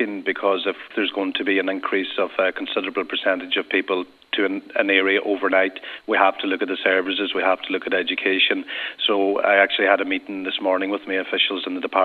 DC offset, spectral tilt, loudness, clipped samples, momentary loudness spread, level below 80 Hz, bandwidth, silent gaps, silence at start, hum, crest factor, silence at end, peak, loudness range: under 0.1%; -5.5 dB/octave; -21 LUFS; under 0.1%; 7 LU; -72 dBFS; 4.8 kHz; none; 0 s; none; 22 dB; 0 s; 0 dBFS; 3 LU